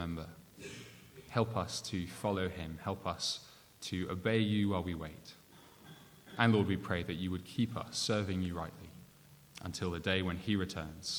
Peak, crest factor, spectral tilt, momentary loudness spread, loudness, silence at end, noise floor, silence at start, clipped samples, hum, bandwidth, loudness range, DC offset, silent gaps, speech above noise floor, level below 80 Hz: -12 dBFS; 26 dB; -5 dB/octave; 22 LU; -36 LUFS; 0 s; -60 dBFS; 0 s; under 0.1%; none; over 20 kHz; 3 LU; under 0.1%; none; 25 dB; -60 dBFS